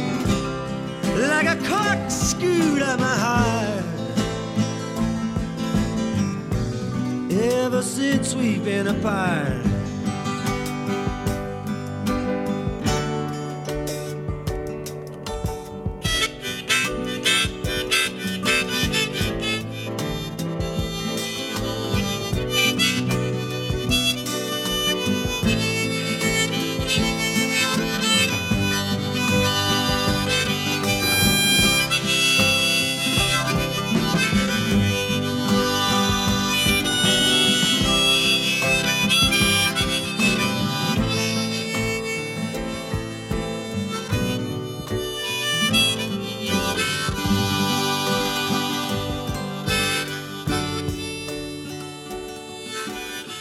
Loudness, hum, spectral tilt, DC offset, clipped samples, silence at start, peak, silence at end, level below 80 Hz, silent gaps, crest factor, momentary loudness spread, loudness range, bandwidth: -21 LUFS; none; -3.5 dB/octave; under 0.1%; under 0.1%; 0 s; -4 dBFS; 0 s; -40 dBFS; none; 18 dB; 12 LU; 8 LU; 17.5 kHz